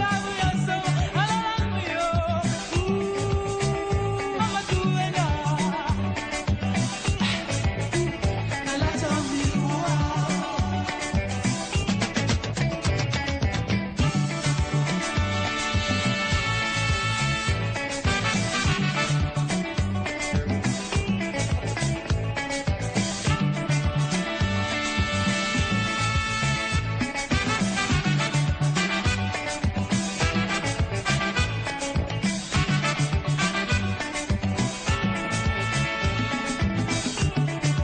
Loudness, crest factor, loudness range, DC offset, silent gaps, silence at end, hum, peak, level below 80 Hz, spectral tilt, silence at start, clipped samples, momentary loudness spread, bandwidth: -25 LUFS; 16 dB; 2 LU; under 0.1%; none; 0 s; none; -10 dBFS; -36 dBFS; -4.5 dB/octave; 0 s; under 0.1%; 3 LU; 10 kHz